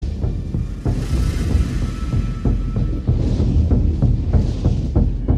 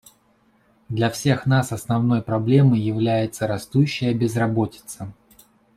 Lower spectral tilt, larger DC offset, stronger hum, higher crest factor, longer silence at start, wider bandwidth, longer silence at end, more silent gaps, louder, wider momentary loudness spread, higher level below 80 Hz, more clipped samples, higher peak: first, -8.5 dB/octave vs -6.5 dB/octave; neither; neither; about the same, 14 dB vs 16 dB; second, 0 s vs 0.9 s; second, 10.5 kHz vs 14 kHz; second, 0 s vs 0.65 s; neither; about the same, -20 LUFS vs -21 LUFS; second, 6 LU vs 12 LU; first, -20 dBFS vs -56 dBFS; neither; about the same, -4 dBFS vs -4 dBFS